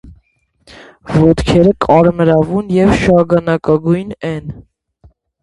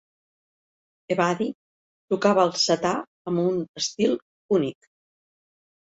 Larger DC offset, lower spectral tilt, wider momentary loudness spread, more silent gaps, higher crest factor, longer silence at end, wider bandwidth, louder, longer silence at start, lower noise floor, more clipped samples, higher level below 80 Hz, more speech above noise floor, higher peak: neither; first, -7.5 dB/octave vs -4.5 dB/octave; about the same, 12 LU vs 11 LU; second, none vs 1.55-2.08 s, 3.07-3.25 s, 3.69-3.74 s, 4.22-4.49 s; second, 14 dB vs 20 dB; second, 0.8 s vs 1.2 s; first, 11.5 kHz vs 8.2 kHz; first, -12 LUFS vs -24 LUFS; second, 0.05 s vs 1.1 s; second, -55 dBFS vs under -90 dBFS; neither; first, -32 dBFS vs -68 dBFS; second, 44 dB vs over 67 dB; first, 0 dBFS vs -6 dBFS